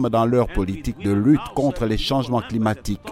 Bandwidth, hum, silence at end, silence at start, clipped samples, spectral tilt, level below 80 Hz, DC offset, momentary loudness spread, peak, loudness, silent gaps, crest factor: 15.5 kHz; none; 0 s; 0 s; under 0.1%; -7 dB/octave; -34 dBFS; under 0.1%; 7 LU; -6 dBFS; -21 LUFS; none; 14 dB